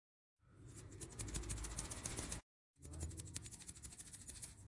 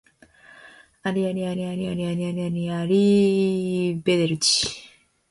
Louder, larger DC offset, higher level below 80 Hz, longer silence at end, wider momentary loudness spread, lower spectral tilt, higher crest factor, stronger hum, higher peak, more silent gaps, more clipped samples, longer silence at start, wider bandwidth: second, -49 LUFS vs -23 LUFS; neither; about the same, -56 dBFS vs -58 dBFS; second, 0 s vs 0.45 s; about the same, 11 LU vs 9 LU; second, -3 dB/octave vs -5 dB/octave; first, 24 dB vs 16 dB; neither; second, -26 dBFS vs -8 dBFS; first, 2.43-2.74 s vs none; neither; second, 0.45 s vs 0.65 s; about the same, 11.5 kHz vs 11.5 kHz